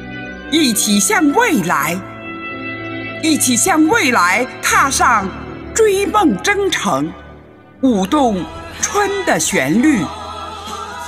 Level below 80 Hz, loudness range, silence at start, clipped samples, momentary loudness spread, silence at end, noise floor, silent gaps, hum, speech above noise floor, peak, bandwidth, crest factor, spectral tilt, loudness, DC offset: -42 dBFS; 3 LU; 0 s; under 0.1%; 15 LU; 0 s; -40 dBFS; none; none; 26 dB; 0 dBFS; 16 kHz; 16 dB; -3 dB/octave; -14 LUFS; under 0.1%